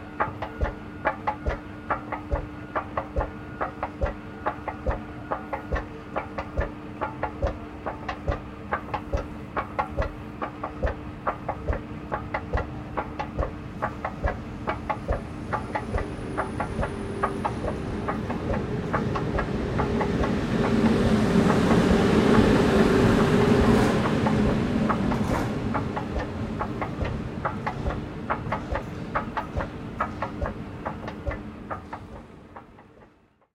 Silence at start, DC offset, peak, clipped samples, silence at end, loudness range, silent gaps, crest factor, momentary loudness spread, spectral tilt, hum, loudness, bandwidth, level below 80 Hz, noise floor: 0 s; under 0.1%; -6 dBFS; under 0.1%; 0.5 s; 12 LU; none; 20 dB; 13 LU; -7 dB/octave; none; -27 LUFS; 14 kHz; -38 dBFS; -59 dBFS